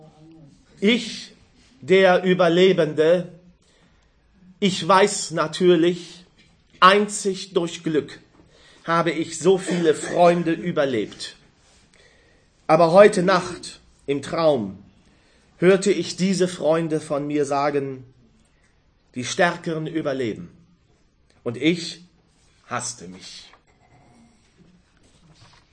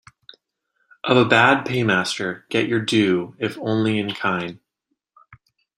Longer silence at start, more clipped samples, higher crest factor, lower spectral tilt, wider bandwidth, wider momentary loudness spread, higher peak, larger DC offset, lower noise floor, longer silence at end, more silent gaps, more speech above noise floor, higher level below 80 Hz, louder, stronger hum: second, 0.8 s vs 1.05 s; neither; about the same, 22 dB vs 20 dB; about the same, -5 dB/octave vs -5 dB/octave; second, 9.8 kHz vs 14.5 kHz; first, 20 LU vs 12 LU; about the same, 0 dBFS vs -2 dBFS; neither; second, -60 dBFS vs -76 dBFS; first, 2.35 s vs 0.4 s; neither; second, 40 dB vs 56 dB; about the same, -62 dBFS vs -62 dBFS; about the same, -20 LUFS vs -20 LUFS; neither